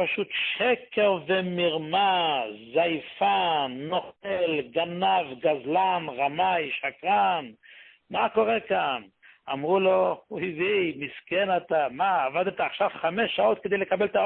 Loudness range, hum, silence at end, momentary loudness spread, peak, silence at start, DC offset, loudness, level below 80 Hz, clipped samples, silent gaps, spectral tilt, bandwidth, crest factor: 2 LU; none; 0 s; 7 LU; -10 dBFS; 0 s; under 0.1%; -26 LUFS; -68 dBFS; under 0.1%; none; -9 dB/octave; 4.4 kHz; 16 dB